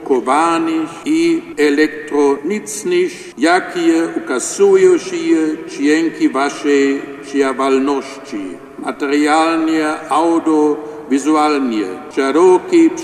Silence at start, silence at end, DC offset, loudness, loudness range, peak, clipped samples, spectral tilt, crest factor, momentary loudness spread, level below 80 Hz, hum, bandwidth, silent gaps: 0 s; 0 s; under 0.1%; -15 LUFS; 2 LU; 0 dBFS; under 0.1%; -4 dB/octave; 14 dB; 10 LU; -60 dBFS; none; 13 kHz; none